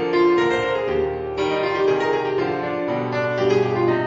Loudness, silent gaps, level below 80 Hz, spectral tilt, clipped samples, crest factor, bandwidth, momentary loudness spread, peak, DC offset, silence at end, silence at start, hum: -21 LUFS; none; -50 dBFS; -6.5 dB/octave; under 0.1%; 14 dB; 7.8 kHz; 6 LU; -6 dBFS; under 0.1%; 0 s; 0 s; none